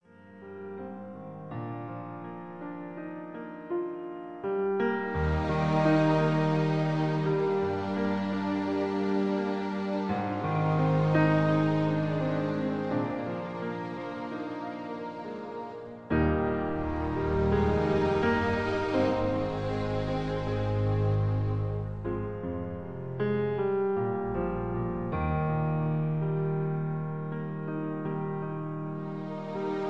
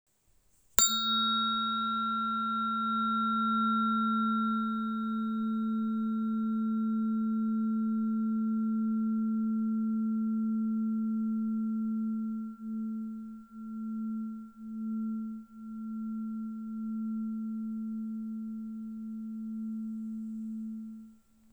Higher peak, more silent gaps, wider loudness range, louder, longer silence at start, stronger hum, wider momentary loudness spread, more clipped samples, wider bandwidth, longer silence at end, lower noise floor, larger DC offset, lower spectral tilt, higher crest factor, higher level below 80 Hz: second, -12 dBFS vs 0 dBFS; neither; second, 7 LU vs 10 LU; about the same, -30 LUFS vs -32 LUFS; second, 0.05 s vs 0.8 s; neither; about the same, 14 LU vs 12 LU; neither; second, 7.6 kHz vs over 20 kHz; second, 0 s vs 0.4 s; second, -49 dBFS vs -67 dBFS; first, 0.2% vs under 0.1%; first, -8.5 dB/octave vs -3.5 dB/octave; second, 16 dB vs 32 dB; first, -46 dBFS vs -70 dBFS